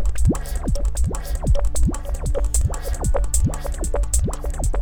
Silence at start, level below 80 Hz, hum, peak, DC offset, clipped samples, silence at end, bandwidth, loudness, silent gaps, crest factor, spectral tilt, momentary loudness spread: 0 s; -22 dBFS; none; -4 dBFS; under 0.1%; under 0.1%; 0 s; over 20 kHz; -24 LUFS; none; 16 dB; -5.5 dB/octave; 5 LU